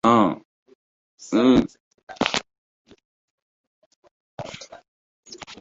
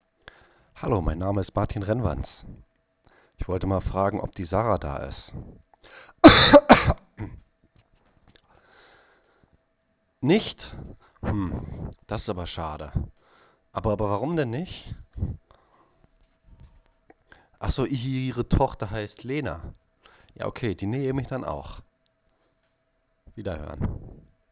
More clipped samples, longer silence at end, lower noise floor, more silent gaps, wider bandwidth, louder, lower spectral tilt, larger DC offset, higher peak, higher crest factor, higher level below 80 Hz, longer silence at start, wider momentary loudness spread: neither; second, 0.05 s vs 0.35 s; second, -38 dBFS vs -71 dBFS; first, 0.45-0.66 s, 0.75-1.18 s, 1.80-1.91 s, 2.03-2.07 s, 2.58-2.85 s, 3.05-4.02 s, 4.11-4.38 s, 4.88-5.23 s vs none; first, 8 kHz vs 4 kHz; first, -21 LUFS vs -24 LUFS; second, -5 dB/octave vs -10.5 dB/octave; neither; about the same, -2 dBFS vs 0 dBFS; about the same, 24 dB vs 26 dB; second, -52 dBFS vs -40 dBFS; second, 0.05 s vs 0.75 s; first, 27 LU vs 22 LU